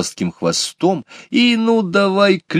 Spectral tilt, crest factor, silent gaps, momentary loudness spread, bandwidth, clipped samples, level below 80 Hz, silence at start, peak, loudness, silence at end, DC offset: -4.5 dB/octave; 16 dB; none; 7 LU; 14 kHz; under 0.1%; -60 dBFS; 0 s; 0 dBFS; -16 LUFS; 0 s; under 0.1%